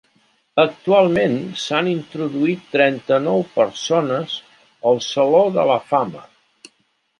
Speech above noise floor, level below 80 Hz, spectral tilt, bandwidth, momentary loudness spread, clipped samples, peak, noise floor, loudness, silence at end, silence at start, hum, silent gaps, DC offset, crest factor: 48 dB; -64 dBFS; -5.5 dB/octave; 11 kHz; 9 LU; under 0.1%; 0 dBFS; -65 dBFS; -18 LUFS; 0.95 s; 0.55 s; none; none; under 0.1%; 18 dB